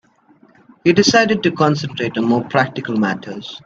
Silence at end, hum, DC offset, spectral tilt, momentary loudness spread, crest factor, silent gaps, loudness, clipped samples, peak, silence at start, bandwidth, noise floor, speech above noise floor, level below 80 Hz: 0.05 s; none; under 0.1%; -5 dB/octave; 9 LU; 18 dB; none; -16 LUFS; under 0.1%; 0 dBFS; 0.85 s; 7.8 kHz; -52 dBFS; 35 dB; -56 dBFS